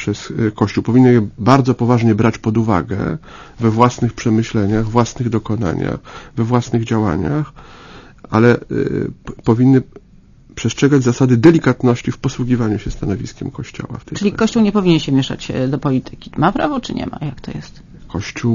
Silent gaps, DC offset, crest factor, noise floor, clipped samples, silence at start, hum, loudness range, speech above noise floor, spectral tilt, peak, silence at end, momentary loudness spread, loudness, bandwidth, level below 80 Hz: none; under 0.1%; 16 dB; -44 dBFS; under 0.1%; 0 s; none; 4 LU; 29 dB; -7 dB/octave; 0 dBFS; 0 s; 15 LU; -16 LUFS; 7.4 kHz; -38 dBFS